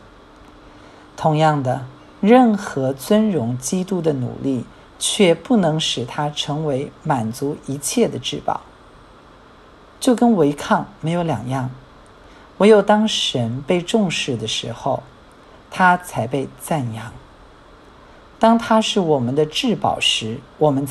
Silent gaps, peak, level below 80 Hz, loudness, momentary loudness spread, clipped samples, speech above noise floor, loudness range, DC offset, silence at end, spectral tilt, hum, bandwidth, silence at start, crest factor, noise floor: none; 0 dBFS; -52 dBFS; -19 LUFS; 11 LU; under 0.1%; 27 dB; 5 LU; under 0.1%; 0 s; -5 dB/octave; none; 13 kHz; 1.15 s; 18 dB; -46 dBFS